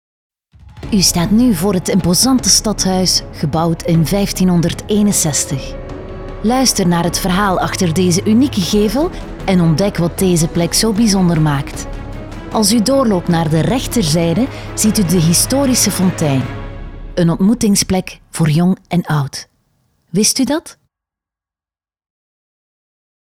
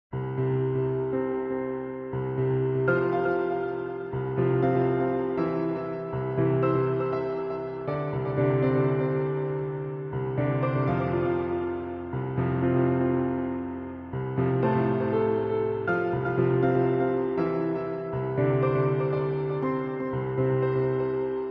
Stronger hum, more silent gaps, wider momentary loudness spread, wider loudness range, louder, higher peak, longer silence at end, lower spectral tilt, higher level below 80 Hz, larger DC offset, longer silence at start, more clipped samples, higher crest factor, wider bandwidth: neither; neither; first, 12 LU vs 8 LU; about the same, 4 LU vs 2 LU; first, -14 LUFS vs -27 LUFS; first, 0 dBFS vs -12 dBFS; first, 2.55 s vs 0 s; second, -4.5 dB/octave vs -11 dB/octave; first, -32 dBFS vs -54 dBFS; first, 0.2% vs under 0.1%; first, 0.65 s vs 0.1 s; neither; about the same, 14 dB vs 14 dB; first, 17 kHz vs 5 kHz